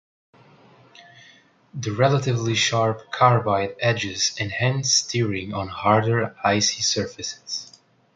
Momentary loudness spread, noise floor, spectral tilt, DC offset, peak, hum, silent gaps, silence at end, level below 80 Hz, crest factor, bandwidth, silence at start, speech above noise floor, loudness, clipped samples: 11 LU; -54 dBFS; -3.5 dB/octave; under 0.1%; -2 dBFS; none; none; 0.5 s; -54 dBFS; 22 dB; 9.4 kHz; 1 s; 32 dB; -22 LUFS; under 0.1%